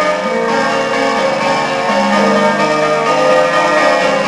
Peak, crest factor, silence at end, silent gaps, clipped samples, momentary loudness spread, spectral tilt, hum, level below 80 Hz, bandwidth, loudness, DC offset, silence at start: 0 dBFS; 12 dB; 0 s; none; under 0.1%; 3 LU; -4 dB/octave; none; -50 dBFS; 11 kHz; -12 LUFS; under 0.1%; 0 s